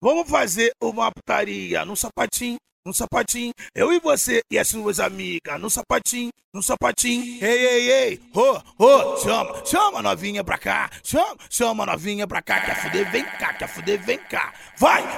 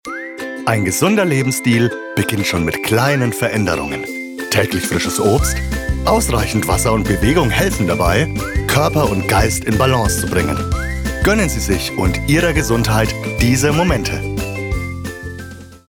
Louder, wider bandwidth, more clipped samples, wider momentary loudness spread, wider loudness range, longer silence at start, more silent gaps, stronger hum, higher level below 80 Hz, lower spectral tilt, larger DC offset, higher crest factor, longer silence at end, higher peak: second, -21 LUFS vs -16 LUFS; second, 17 kHz vs 19.5 kHz; neither; about the same, 8 LU vs 9 LU; first, 5 LU vs 2 LU; about the same, 0 s vs 0.05 s; first, 2.72-2.83 s, 6.44-6.52 s vs none; neither; second, -50 dBFS vs -26 dBFS; second, -2.5 dB/octave vs -5 dB/octave; neither; first, 20 dB vs 14 dB; about the same, 0 s vs 0.1 s; about the same, -2 dBFS vs -2 dBFS